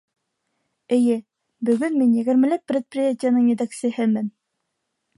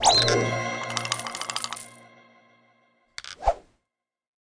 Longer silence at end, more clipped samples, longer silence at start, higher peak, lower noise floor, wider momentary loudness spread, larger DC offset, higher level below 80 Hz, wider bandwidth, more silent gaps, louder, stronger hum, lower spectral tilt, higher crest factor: about the same, 0.9 s vs 0.9 s; neither; first, 0.9 s vs 0 s; about the same, -8 dBFS vs -6 dBFS; second, -77 dBFS vs -84 dBFS; second, 7 LU vs 20 LU; neither; second, -74 dBFS vs -46 dBFS; about the same, 11.5 kHz vs 10.5 kHz; neither; first, -21 LUFS vs -26 LUFS; neither; first, -6.5 dB/octave vs -2.5 dB/octave; second, 14 dB vs 24 dB